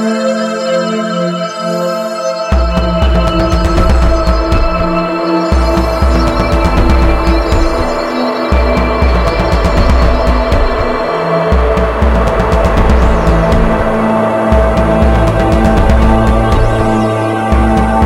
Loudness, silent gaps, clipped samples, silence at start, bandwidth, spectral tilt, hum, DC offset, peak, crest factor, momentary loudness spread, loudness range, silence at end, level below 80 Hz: -12 LUFS; none; 0.1%; 0 s; 11.5 kHz; -7 dB/octave; none; under 0.1%; 0 dBFS; 10 dB; 4 LU; 2 LU; 0 s; -14 dBFS